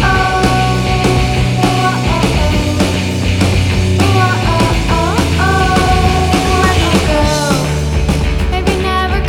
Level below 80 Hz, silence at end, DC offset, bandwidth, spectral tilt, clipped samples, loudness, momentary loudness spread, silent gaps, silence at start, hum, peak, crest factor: -20 dBFS; 0 s; under 0.1%; 17 kHz; -5.5 dB/octave; under 0.1%; -12 LUFS; 4 LU; none; 0 s; none; 0 dBFS; 12 dB